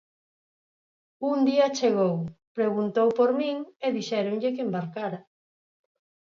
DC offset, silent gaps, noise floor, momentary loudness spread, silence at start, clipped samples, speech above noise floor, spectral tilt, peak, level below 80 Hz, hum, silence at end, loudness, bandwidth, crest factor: under 0.1%; 2.47-2.55 s, 3.76-3.80 s; under -90 dBFS; 11 LU; 1.2 s; under 0.1%; over 65 dB; -6 dB/octave; -10 dBFS; -72 dBFS; none; 1 s; -26 LUFS; 7.4 kHz; 16 dB